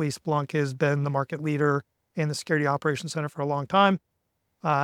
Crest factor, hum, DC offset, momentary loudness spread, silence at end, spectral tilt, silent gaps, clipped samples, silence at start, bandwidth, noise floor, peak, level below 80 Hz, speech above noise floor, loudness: 20 dB; none; under 0.1%; 9 LU; 0 s; -6 dB/octave; none; under 0.1%; 0 s; 13.5 kHz; -76 dBFS; -6 dBFS; -70 dBFS; 51 dB; -26 LUFS